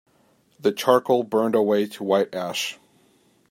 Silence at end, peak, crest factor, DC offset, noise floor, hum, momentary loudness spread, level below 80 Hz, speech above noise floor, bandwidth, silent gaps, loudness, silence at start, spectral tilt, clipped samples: 0.75 s; -4 dBFS; 20 dB; under 0.1%; -61 dBFS; none; 7 LU; -72 dBFS; 40 dB; 16.5 kHz; none; -22 LUFS; 0.65 s; -4.5 dB/octave; under 0.1%